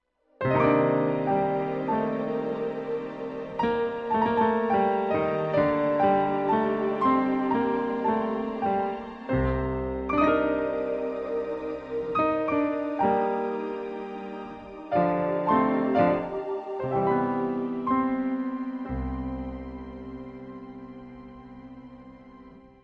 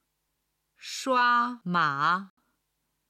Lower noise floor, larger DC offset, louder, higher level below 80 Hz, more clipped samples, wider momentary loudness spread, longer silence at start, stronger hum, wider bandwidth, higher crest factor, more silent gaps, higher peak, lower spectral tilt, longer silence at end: second, -49 dBFS vs -79 dBFS; neither; about the same, -26 LUFS vs -26 LUFS; first, -46 dBFS vs -80 dBFS; neither; first, 17 LU vs 13 LU; second, 0.4 s vs 0.8 s; neither; second, 6.2 kHz vs 14 kHz; about the same, 18 dB vs 16 dB; neither; about the same, -10 dBFS vs -12 dBFS; first, -9 dB/octave vs -4 dB/octave; second, 0.15 s vs 0.85 s